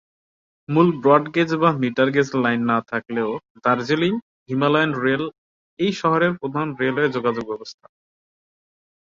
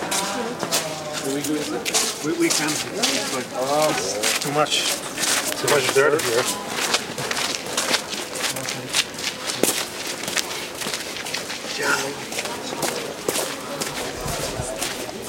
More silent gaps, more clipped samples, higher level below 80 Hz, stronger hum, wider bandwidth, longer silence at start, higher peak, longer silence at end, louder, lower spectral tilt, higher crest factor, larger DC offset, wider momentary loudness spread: first, 3.50-3.55 s, 4.22-4.46 s, 5.38-5.77 s vs none; neither; second, -62 dBFS vs -52 dBFS; neither; second, 7.6 kHz vs 17 kHz; first, 0.7 s vs 0 s; about the same, -2 dBFS vs 0 dBFS; first, 1.3 s vs 0 s; about the same, -20 LUFS vs -22 LUFS; first, -6.5 dB/octave vs -2 dB/octave; about the same, 20 dB vs 24 dB; neither; about the same, 10 LU vs 8 LU